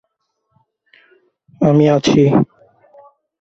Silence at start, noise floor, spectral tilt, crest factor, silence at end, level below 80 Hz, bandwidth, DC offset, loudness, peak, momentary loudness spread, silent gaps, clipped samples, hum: 1.6 s; -70 dBFS; -7 dB/octave; 16 dB; 0.95 s; -50 dBFS; 8 kHz; under 0.1%; -14 LUFS; -2 dBFS; 6 LU; none; under 0.1%; none